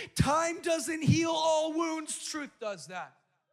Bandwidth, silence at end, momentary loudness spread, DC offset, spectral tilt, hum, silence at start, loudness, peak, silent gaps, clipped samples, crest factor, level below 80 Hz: 15.5 kHz; 0.45 s; 13 LU; under 0.1%; -4.5 dB/octave; none; 0 s; -30 LUFS; -12 dBFS; none; under 0.1%; 18 dB; -54 dBFS